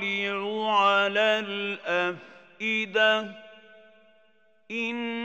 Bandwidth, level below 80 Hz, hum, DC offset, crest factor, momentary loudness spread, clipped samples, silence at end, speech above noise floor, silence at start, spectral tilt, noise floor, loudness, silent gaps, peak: 16 kHz; under -90 dBFS; none; under 0.1%; 18 dB; 10 LU; under 0.1%; 0 s; 38 dB; 0 s; -4 dB/octave; -65 dBFS; -25 LUFS; none; -10 dBFS